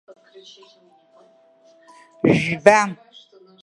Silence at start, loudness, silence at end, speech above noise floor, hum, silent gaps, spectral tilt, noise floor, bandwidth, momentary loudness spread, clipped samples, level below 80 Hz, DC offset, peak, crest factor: 2.25 s; -17 LUFS; 0.7 s; 35 dB; none; none; -5.5 dB/octave; -54 dBFS; 11.5 kHz; 12 LU; under 0.1%; -58 dBFS; under 0.1%; 0 dBFS; 22 dB